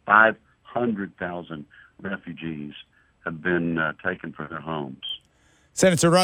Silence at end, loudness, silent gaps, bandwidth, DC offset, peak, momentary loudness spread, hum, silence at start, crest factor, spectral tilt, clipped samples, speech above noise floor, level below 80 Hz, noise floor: 0 s; -25 LUFS; none; 16 kHz; under 0.1%; -2 dBFS; 19 LU; none; 0.05 s; 24 dB; -4.5 dB/octave; under 0.1%; 37 dB; -60 dBFS; -61 dBFS